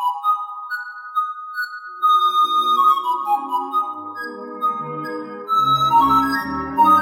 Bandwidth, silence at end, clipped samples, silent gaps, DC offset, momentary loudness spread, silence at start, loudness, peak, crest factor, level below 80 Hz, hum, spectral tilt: 16.5 kHz; 0 s; under 0.1%; none; under 0.1%; 14 LU; 0 s; -19 LUFS; -4 dBFS; 14 dB; -52 dBFS; none; -4 dB/octave